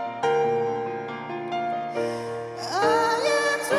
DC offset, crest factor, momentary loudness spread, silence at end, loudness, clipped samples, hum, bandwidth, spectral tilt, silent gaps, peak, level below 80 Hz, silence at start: under 0.1%; 16 dB; 11 LU; 0 s; -25 LUFS; under 0.1%; none; 14.5 kHz; -3.5 dB/octave; none; -10 dBFS; -72 dBFS; 0 s